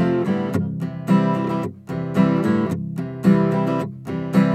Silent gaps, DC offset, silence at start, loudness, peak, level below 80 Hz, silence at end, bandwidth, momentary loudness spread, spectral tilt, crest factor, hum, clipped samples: none; under 0.1%; 0 s; -21 LUFS; -4 dBFS; -56 dBFS; 0 s; 13 kHz; 10 LU; -8.5 dB/octave; 16 dB; none; under 0.1%